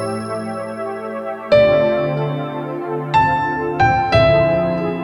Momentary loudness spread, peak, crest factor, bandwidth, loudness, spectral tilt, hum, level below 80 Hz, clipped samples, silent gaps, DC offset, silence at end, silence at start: 13 LU; -2 dBFS; 14 dB; 11.5 kHz; -17 LUFS; -7 dB/octave; none; -40 dBFS; under 0.1%; none; under 0.1%; 0 s; 0 s